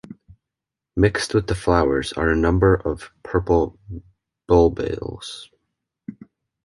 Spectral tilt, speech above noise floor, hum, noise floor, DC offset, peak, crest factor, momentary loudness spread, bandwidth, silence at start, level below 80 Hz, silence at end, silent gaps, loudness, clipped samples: -6.5 dB/octave; 66 dB; none; -86 dBFS; under 0.1%; -2 dBFS; 20 dB; 22 LU; 11.5 kHz; 0.1 s; -34 dBFS; 0.55 s; none; -20 LUFS; under 0.1%